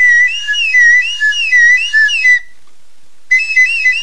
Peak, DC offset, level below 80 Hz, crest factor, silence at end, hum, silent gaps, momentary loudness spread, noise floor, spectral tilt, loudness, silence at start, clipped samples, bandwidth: -2 dBFS; 4%; -56 dBFS; 10 dB; 0 s; none; none; 6 LU; -54 dBFS; 4.5 dB/octave; -8 LUFS; 0 s; under 0.1%; 10.5 kHz